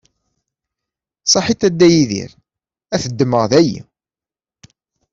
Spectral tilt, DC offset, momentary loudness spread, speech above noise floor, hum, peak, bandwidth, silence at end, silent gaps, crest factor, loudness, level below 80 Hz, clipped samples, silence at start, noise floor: -4.5 dB/octave; under 0.1%; 13 LU; over 76 dB; none; -2 dBFS; 7.8 kHz; 1.3 s; none; 16 dB; -15 LUFS; -50 dBFS; under 0.1%; 1.25 s; under -90 dBFS